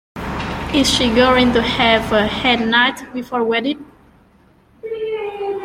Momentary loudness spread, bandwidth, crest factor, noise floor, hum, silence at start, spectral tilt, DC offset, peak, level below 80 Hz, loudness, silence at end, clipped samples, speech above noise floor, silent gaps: 14 LU; 16 kHz; 16 dB; -52 dBFS; none; 0.15 s; -4 dB/octave; under 0.1%; -2 dBFS; -36 dBFS; -16 LUFS; 0 s; under 0.1%; 36 dB; none